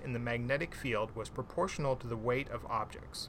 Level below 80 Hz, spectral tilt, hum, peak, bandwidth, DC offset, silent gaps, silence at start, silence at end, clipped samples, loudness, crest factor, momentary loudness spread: -52 dBFS; -5.5 dB/octave; none; -20 dBFS; 16.5 kHz; under 0.1%; none; 0 s; 0 s; under 0.1%; -36 LUFS; 16 dB; 6 LU